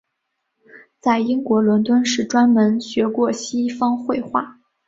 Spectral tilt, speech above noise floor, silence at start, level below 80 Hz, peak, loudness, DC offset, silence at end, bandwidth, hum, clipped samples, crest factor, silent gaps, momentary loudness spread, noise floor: -5 dB/octave; 58 dB; 0.75 s; -62 dBFS; -4 dBFS; -19 LUFS; under 0.1%; 0.35 s; 7.8 kHz; none; under 0.1%; 16 dB; none; 8 LU; -75 dBFS